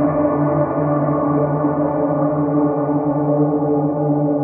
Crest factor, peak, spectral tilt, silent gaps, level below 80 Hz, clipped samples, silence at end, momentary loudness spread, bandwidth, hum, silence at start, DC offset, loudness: 12 dB; -6 dBFS; -12.5 dB/octave; none; -50 dBFS; under 0.1%; 0 s; 1 LU; 2.6 kHz; none; 0 s; under 0.1%; -18 LUFS